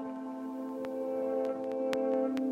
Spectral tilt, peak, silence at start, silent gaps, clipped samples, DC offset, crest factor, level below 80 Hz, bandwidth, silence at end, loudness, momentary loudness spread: -6 dB/octave; -14 dBFS; 0 s; none; under 0.1%; under 0.1%; 20 dB; -78 dBFS; 15 kHz; 0 s; -34 LUFS; 9 LU